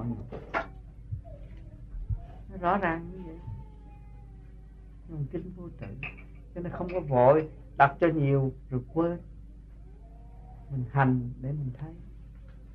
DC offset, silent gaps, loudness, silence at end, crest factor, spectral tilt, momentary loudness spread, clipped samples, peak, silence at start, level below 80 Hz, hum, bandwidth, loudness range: under 0.1%; none; -29 LUFS; 0 s; 24 dB; -10 dB/octave; 26 LU; under 0.1%; -8 dBFS; 0 s; -46 dBFS; none; 5.4 kHz; 14 LU